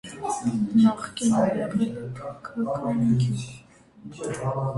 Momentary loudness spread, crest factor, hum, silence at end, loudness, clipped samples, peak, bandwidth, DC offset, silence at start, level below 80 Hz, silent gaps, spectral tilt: 15 LU; 16 dB; none; 0 s; -25 LUFS; under 0.1%; -8 dBFS; 11.5 kHz; under 0.1%; 0.05 s; -56 dBFS; none; -6.5 dB/octave